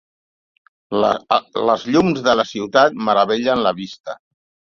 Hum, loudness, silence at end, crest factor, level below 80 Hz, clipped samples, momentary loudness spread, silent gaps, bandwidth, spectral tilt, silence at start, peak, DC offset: none; -17 LUFS; 0.55 s; 18 dB; -56 dBFS; under 0.1%; 14 LU; 4.00-4.04 s; 7.4 kHz; -5 dB/octave; 0.9 s; 0 dBFS; under 0.1%